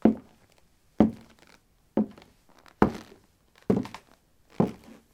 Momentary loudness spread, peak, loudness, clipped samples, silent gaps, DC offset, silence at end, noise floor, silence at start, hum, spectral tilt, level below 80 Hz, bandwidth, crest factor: 19 LU; -2 dBFS; -28 LUFS; under 0.1%; none; under 0.1%; 0.4 s; -62 dBFS; 0.05 s; none; -8.5 dB/octave; -54 dBFS; 9.6 kHz; 28 dB